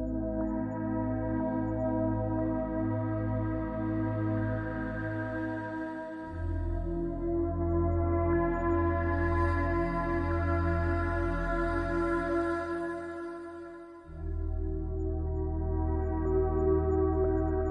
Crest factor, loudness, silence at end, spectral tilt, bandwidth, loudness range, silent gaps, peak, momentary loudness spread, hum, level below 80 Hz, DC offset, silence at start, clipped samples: 14 dB; -31 LUFS; 0 s; -10 dB/octave; 5.2 kHz; 5 LU; none; -16 dBFS; 9 LU; none; -38 dBFS; under 0.1%; 0 s; under 0.1%